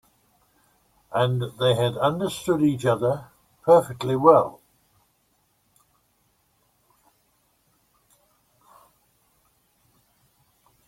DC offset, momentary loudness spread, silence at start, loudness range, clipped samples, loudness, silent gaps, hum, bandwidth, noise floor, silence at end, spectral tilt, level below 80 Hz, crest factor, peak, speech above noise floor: under 0.1%; 12 LU; 1.1 s; 4 LU; under 0.1%; -22 LUFS; none; none; 16 kHz; -68 dBFS; 6.35 s; -6.5 dB/octave; -62 dBFS; 24 dB; -2 dBFS; 47 dB